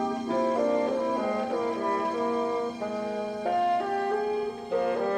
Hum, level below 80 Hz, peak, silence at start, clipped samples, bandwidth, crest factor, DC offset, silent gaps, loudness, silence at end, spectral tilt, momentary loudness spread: none; -66 dBFS; -16 dBFS; 0 s; under 0.1%; 11.5 kHz; 12 dB; under 0.1%; none; -28 LUFS; 0 s; -5.5 dB/octave; 6 LU